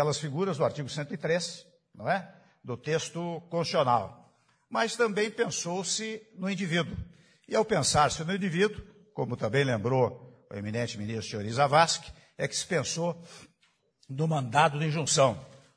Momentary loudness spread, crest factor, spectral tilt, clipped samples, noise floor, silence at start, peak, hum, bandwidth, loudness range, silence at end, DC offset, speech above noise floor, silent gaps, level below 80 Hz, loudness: 16 LU; 22 dB; -4 dB/octave; under 0.1%; -70 dBFS; 0 s; -8 dBFS; none; 10.5 kHz; 3 LU; 0.2 s; under 0.1%; 42 dB; none; -60 dBFS; -29 LUFS